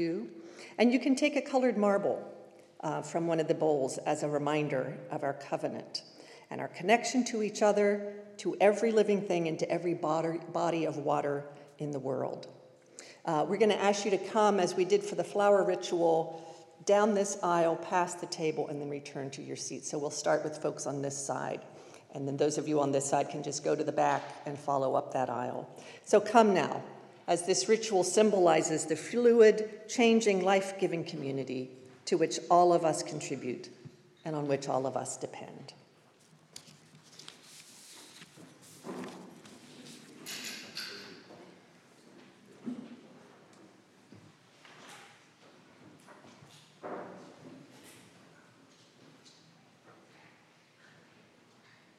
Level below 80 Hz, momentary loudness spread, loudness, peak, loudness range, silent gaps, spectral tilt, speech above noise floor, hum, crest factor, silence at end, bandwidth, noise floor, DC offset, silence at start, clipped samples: under -90 dBFS; 23 LU; -30 LUFS; -8 dBFS; 23 LU; none; -4.5 dB/octave; 33 dB; none; 24 dB; 4.1 s; 13.5 kHz; -63 dBFS; under 0.1%; 0 s; under 0.1%